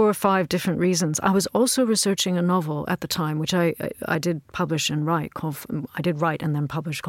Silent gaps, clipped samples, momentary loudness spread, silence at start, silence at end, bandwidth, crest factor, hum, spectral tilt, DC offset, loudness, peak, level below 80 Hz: none; under 0.1%; 7 LU; 0 s; 0 s; 17 kHz; 16 dB; none; -4.5 dB/octave; under 0.1%; -23 LUFS; -6 dBFS; -58 dBFS